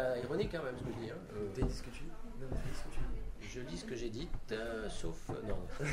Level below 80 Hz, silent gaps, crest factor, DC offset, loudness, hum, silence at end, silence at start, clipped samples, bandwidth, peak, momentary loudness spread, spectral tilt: -44 dBFS; none; 16 dB; under 0.1%; -42 LUFS; none; 0 s; 0 s; under 0.1%; 12.5 kHz; -22 dBFS; 9 LU; -6 dB/octave